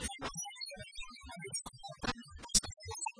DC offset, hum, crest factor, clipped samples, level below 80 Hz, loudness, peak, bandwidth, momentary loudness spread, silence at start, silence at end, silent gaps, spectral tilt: under 0.1%; none; 28 dB; under 0.1%; -52 dBFS; -38 LUFS; -14 dBFS; 11 kHz; 16 LU; 0 s; 0 s; none; -1.5 dB/octave